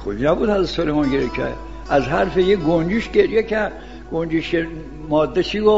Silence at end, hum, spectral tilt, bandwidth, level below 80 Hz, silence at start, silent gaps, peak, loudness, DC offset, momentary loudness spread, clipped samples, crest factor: 0 s; none; -7 dB/octave; 7.8 kHz; -36 dBFS; 0 s; none; -2 dBFS; -19 LUFS; 0.6%; 10 LU; under 0.1%; 18 dB